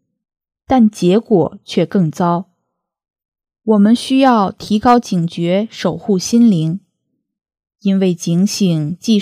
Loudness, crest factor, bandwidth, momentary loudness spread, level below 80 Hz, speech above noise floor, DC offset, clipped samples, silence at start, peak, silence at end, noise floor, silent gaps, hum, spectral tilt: -14 LUFS; 14 dB; 14.5 kHz; 8 LU; -52 dBFS; 60 dB; under 0.1%; under 0.1%; 0.7 s; 0 dBFS; 0 s; -73 dBFS; 3.28-3.32 s; none; -6.5 dB/octave